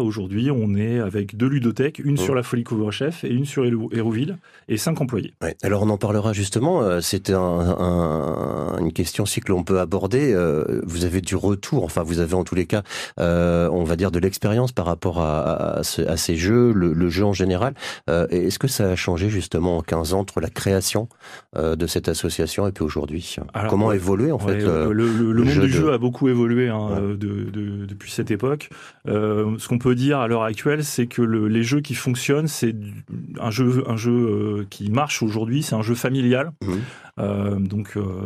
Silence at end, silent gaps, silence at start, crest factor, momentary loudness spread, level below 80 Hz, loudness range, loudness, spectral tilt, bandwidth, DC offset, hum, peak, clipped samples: 0 s; none; 0 s; 18 dB; 7 LU; -42 dBFS; 3 LU; -22 LUFS; -6 dB/octave; 14.5 kHz; under 0.1%; none; -4 dBFS; under 0.1%